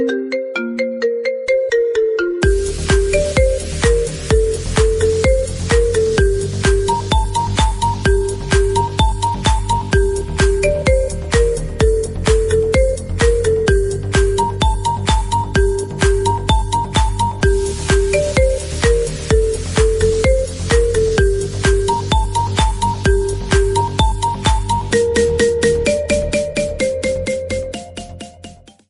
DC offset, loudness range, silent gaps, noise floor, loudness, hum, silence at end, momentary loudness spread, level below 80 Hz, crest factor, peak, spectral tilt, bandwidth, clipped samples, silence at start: under 0.1%; 1 LU; none; -39 dBFS; -16 LUFS; none; 0.35 s; 4 LU; -20 dBFS; 14 dB; -2 dBFS; -5 dB/octave; 11.5 kHz; under 0.1%; 0 s